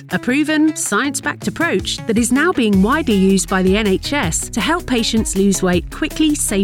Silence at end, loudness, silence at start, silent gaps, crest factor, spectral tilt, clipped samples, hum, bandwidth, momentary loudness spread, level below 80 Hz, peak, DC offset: 0 s; -16 LUFS; 0 s; none; 12 dB; -4 dB/octave; under 0.1%; none; 17 kHz; 5 LU; -34 dBFS; -4 dBFS; under 0.1%